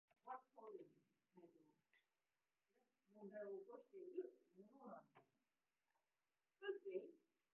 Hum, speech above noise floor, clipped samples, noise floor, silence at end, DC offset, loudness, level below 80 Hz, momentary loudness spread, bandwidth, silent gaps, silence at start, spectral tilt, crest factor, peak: none; over 35 dB; under 0.1%; under -90 dBFS; 0.35 s; under 0.1%; -57 LUFS; under -90 dBFS; 11 LU; 3.2 kHz; none; 0.25 s; -1.5 dB/octave; 22 dB; -38 dBFS